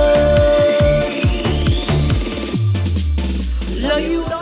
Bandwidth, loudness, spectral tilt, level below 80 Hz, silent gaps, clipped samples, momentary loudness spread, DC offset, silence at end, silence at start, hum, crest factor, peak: 4 kHz; -17 LUFS; -11 dB/octave; -22 dBFS; none; under 0.1%; 9 LU; under 0.1%; 0 s; 0 s; none; 12 dB; -2 dBFS